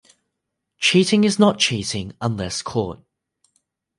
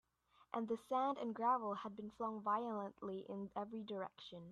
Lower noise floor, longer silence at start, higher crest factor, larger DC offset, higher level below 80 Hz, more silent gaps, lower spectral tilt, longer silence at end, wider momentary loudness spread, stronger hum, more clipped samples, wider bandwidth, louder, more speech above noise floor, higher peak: first, -79 dBFS vs -72 dBFS; first, 0.8 s vs 0.55 s; about the same, 18 dB vs 18 dB; neither; first, -50 dBFS vs -82 dBFS; neither; second, -4 dB/octave vs -7 dB/octave; first, 1.05 s vs 0 s; about the same, 11 LU vs 10 LU; neither; neither; about the same, 11.5 kHz vs 12.5 kHz; first, -19 LUFS vs -43 LUFS; first, 60 dB vs 30 dB; first, -4 dBFS vs -26 dBFS